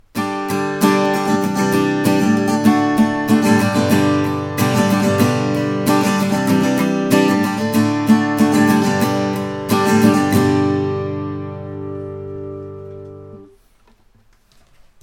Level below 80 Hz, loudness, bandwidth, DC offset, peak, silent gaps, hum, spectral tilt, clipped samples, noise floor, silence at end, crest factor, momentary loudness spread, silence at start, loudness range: -52 dBFS; -16 LUFS; 17.5 kHz; under 0.1%; 0 dBFS; none; none; -6 dB/octave; under 0.1%; -52 dBFS; 1.6 s; 16 dB; 15 LU; 0.15 s; 12 LU